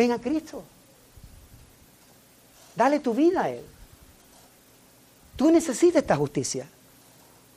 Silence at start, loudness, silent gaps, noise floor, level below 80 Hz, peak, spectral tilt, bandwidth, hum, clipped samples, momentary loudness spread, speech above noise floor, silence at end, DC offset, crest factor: 0 s; -24 LUFS; none; -56 dBFS; -58 dBFS; -8 dBFS; -5 dB/octave; 15.5 kHz; none; under 0.1%; 20 LU; 33 dB; 0.9 s; under 0.1%; 20 dB